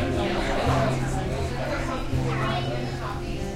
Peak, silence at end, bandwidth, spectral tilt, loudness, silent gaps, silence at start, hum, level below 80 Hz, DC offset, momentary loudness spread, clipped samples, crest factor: -12 dBFS; 0 s; 14 kHz; -6 dB/octave; -27 LUFS; none; 0 s; none; -34 dBFS; under 0.1%; 7 LU; under 0.1%; 14 dB